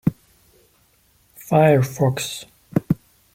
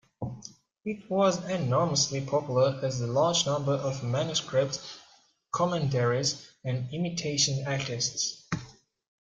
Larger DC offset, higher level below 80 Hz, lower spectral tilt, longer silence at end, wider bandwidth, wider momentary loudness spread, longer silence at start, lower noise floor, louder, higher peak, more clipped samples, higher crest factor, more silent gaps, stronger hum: neither; first, -52 dBFS vs -62 dBFS; first, -6.5 dB/octave vs -4 dB/octave; about the same, 0.4 s vs 0.5 s; first, 16.5 kHz vs 9.4 kHz; about the same, 14 LU vs 12 LU; second, 0.05 s vs 0.2 s; about the same, -59 dBFS vs -61 dBFS; first, -20 LUFS vs -28 LUFS; first, -2 dBFS vs -10 dBFS; neither; about the same, 20 dB vs 20 dB; neither; neither